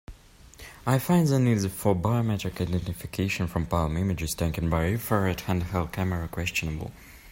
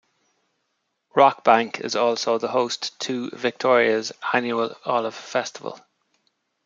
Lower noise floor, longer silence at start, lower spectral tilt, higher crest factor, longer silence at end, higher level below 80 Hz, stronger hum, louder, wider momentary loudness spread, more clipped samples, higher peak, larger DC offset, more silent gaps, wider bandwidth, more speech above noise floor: second, -50 dBFS vs -75 dBFS; second, 0.1 s vs 1.15 s; first, -6 dB/octave vs -3.5 dB/octave; about the same, 18 dB vs 22 dB; second, 0 s vs 0.85 s; first, -44 dBFS vs -74 dBFS; neither; second, -27 LUFS vs -22 LUFS; about the same, 10 LU vs 9 LU; neither; second, -8 dBFS vs -2 dBFS; neither; neither; first, 16.5 kHz vs 7.6 kHz; second, 24 dB vs 53 dB